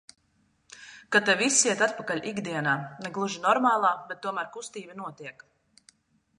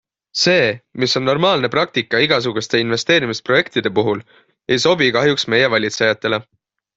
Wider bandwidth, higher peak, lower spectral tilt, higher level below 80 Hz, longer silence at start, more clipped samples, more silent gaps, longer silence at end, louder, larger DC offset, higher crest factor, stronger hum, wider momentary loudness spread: first, 11.5 kHz vs 8 kHz; second, -6 dBFS vs -2 dBFS; second, -2.5 dB/octave vs -4 dB/octave; second, -76 dBFS vs -56 dBFS; first, 0.75 s vs 0.35 s; neither; neither; first, 1.05 s vs 0.55 s; second, -26 LUFS vs -16 LUFS; neither; first, 22 dB vs 16 dB; neither; first, 20 LU vs 7 LU